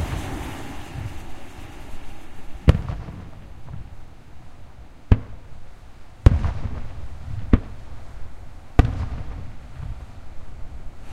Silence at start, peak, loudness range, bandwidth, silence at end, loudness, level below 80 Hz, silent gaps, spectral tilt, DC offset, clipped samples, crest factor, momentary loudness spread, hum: 0 s; 0 dBFS; 5 LU; 13 kHz; 0 s; -25 LUFS; -28 dBFS; none; -7.5 dB/octave; under 0.1%; under 0.1%; 24 dB; 26 LU; none